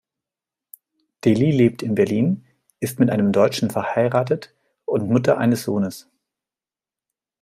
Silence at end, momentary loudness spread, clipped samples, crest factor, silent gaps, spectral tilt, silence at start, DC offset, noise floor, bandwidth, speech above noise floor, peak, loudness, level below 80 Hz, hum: 1.4 s; 11 LU; under 0.1%; 18 dB; none; -7 dB/octave; 1.25 s; under 0.1%; under -90 dBFS; 15.5 kHz; over 71 dB; -4 dBFS; -20 LUFS; -60 dBFS; none